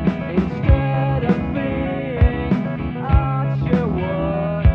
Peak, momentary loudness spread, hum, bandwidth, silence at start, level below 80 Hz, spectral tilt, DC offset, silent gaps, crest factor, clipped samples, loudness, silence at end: -4 dBFS; 5 LU; none; 5.6 kHz; 0 s; -24 dBFS; -10 dB/octave; under 0.1%; none; 16 dB; under 0.1%; -20 LUFS; 0 s